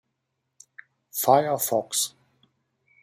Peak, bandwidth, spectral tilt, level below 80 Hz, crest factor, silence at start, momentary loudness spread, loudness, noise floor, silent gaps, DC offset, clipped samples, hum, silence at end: -4 dBFS; 16 kHz; -3 dB/octave; -74 dBFS; 24 dB; 1.15 s; 9 LU; -24 LUFS; -79 dBFS; none; under 0.1%; under 0.1%; none; 0.95 s